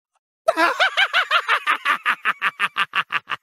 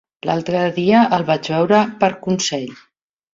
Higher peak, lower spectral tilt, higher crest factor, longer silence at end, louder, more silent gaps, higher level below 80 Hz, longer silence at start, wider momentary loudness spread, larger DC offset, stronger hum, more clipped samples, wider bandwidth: about the same, -2 dBFS vs -2 dBFS; second, -1 dB/octave vs -5 dB/octave; about the same, 18 dB vs 16 dB; second, 0.05 s vs 0.6 s; about the same, -19 LUFS vs -17 LUFS; neither; second, -76 dBFS vs -58 dBFS; first, 0.45 s vs 0.25 s; about the same, 6 LU vs 8 LU; neither; neither; neither; first, 16 kHz vs 7.8 kHz